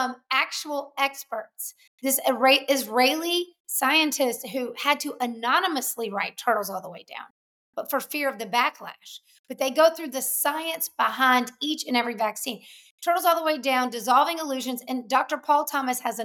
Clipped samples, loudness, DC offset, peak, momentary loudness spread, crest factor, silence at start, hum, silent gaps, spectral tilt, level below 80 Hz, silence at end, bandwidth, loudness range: under 0.1%; -24 LUFS; under 0.1%; -6 dBFS; 15 LU; 18 dB; 0 s; none; 1.87-1.98 s, 3.60-3.65 s, 7.30-7.73 s, 9.39-9.44 s, 12.91-12.98 s; -1 dB/octave; -88 dBFS; 0 s; over 20 kHz; 5 LU